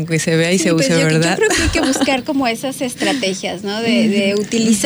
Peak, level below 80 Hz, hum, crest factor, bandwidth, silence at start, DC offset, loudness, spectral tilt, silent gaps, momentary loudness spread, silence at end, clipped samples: -4 dBFS; -36 dBFS; none; 12 dB; over 20 kHz; 0 s; under 0.1%; -16 LUFS; -4 dB/octave; none; 6 LU; 0 s; under 0.1%